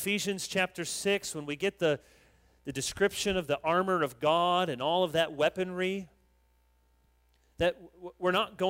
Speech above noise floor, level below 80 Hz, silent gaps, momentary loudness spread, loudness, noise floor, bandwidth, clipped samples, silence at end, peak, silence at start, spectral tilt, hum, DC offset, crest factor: 38 dB; -60 dBFS; none; 8 LU; -30 LUFS; -68 dBFS; 16 kHz; under 0.1%; 0 s; -14 dBFS; 0 s; -3.5 dB/octave; none; under 0.1%; 18 dB